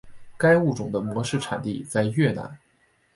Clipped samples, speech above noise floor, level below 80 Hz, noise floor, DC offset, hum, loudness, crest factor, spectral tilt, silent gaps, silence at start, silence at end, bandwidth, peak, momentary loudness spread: under 0.1%; 41 dB; -58 dBFS; -64 dBFS; under 0.1%; none; -24 LUFS; 18 dB; -6 dB/octave; none; 0.05 s; 0.6 s; 11.5 kHz; -6 dBFS; 10 LU